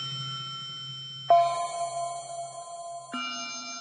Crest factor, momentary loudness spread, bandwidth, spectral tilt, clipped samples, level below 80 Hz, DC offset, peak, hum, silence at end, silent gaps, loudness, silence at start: 20 dB; 16 LU; 10.5 kHz; -2.5 dB/octave; under 0.1%; -80 dBFS; under 0.1%; -10 dBFS; none; 0 s; none; -30 LUFS; 0 s